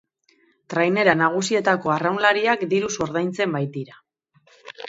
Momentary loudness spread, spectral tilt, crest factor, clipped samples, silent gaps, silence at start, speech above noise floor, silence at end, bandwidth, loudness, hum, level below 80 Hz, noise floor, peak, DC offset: 10 LU; -4.5 dB/octave; 22 dB; under 0.1%; none; 0.7 s; 41 dB; 0 s; 8 kHz; -21 LUFS; none; -62 dBFS; -62 dBFS; 0 dBFS; under 0.1%